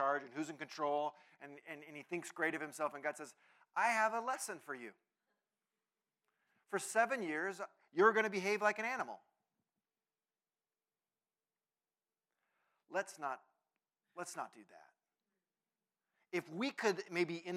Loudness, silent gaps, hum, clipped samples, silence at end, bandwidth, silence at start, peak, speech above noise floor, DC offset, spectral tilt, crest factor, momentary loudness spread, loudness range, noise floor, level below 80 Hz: -38 LUFS; none; none; under 0.1%; 0 s; 16 kHz; 0 s; -16 dBFS; over 51 dB; under 0.1%; -3.5 dB/octave; 24 dB; 17 LU; 13 LU; under -90 dBFS; under -90 dBFS